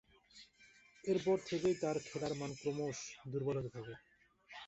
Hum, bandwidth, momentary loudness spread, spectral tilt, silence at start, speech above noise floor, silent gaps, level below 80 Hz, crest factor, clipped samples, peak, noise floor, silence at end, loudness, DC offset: none; 8.2 kHz; 22 LU; -5.5 dB/octave; 0.35 s; 27 dB; none; -70 dBFS; 18 dB; under 0.1%; -24 dBFS; -66 dBFS; 0 s; -39 LUFS; under 0.1%